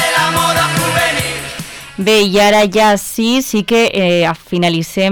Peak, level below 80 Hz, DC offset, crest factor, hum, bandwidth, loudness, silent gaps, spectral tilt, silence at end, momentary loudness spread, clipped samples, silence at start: -4 dBFS; -42 dBFS; under 0.1%; 8 dB; none; 19 kHz; -12 LUFS; none; -4 dB/octave; 0 s; 9 LU; under 0.1%; 0 s